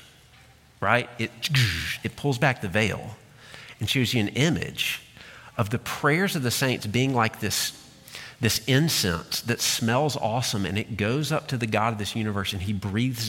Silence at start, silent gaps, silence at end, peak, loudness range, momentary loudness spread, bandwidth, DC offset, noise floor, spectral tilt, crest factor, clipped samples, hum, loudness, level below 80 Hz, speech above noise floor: 0.8 s; none; 0 s; -4 dBFS; 2 LU; 11 LU; 17 kHz; under 0.1%; -54 dBFS; -4 dB/octave; 22 dB; under 0.1%; none; -25 LUFS; -52 dBFS; 28 dB